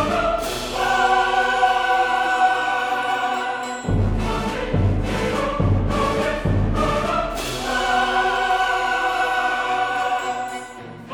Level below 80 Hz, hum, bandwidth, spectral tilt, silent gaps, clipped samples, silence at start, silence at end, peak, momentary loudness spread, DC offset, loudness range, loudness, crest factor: -32 dBFS; none; 19.5 kHz; -5 dB/octave; none; under 0.1%; 0 s; 0 s; -6 dBFS; 7 LU; under 0.1%; 3 LU; -21 LUFS; 16 dB